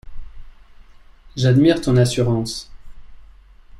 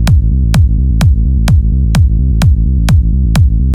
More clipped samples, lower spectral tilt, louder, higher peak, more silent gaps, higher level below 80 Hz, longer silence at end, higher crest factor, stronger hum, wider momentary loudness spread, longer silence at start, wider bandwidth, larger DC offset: neither; about the same, -6.5 dB/octave vs -7 dB/octave; second, -17 LUFS vs -11 LUFS; second, -4 dBFS vs 0 dBFS; neither; second, -40 dBFS vs -10 dBFS; about the same, 0 s vs 0 s; first, 18 dB vs 8 dB; neither; first, 15 LU vs 1 LU; about the same, 0.05 s vs 0 s; about the same, 12.5 kHz vs 13.5 kHz; neither